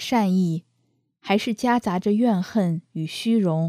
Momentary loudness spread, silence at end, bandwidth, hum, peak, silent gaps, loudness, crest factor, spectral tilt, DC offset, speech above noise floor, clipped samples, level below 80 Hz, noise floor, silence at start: 9 LU; 0 s; 14.5 kHz; none; -8 dBFS; none; -23 LUFS; 14 dB; -6.5 dB/octave; under 0.1%; 48 dB; under 0.1%; -64 dBFS; -69 dBFS; 0 s